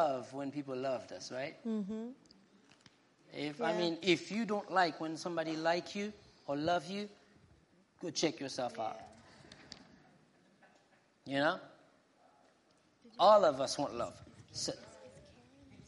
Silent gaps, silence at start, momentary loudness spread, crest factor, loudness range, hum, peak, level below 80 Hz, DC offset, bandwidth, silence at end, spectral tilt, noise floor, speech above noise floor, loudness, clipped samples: none; 0 s; 21 LU; 22 dB; 9 LU; none; -14 dBFS; -76 dBFS; under 0.1%; 11.5 kHz; 0.1 s; -4 dB/octave; -70 dBFS; 35 dB; -35 LUFS; under 0.1%